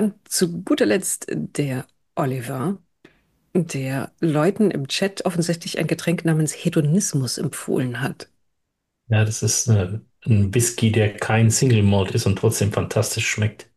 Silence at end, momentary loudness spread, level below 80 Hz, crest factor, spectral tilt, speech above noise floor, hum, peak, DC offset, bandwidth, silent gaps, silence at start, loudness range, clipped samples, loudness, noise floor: 0.15 s; 9 LU; -56 dBFS; 14 dB; -5 dB/octave; 55 dB; none; -8 dBFS; under 0.1%; 12.5 kHz; none; 0 s; 5 LU; under 0.1%; -21 LUFS; -76 dBFS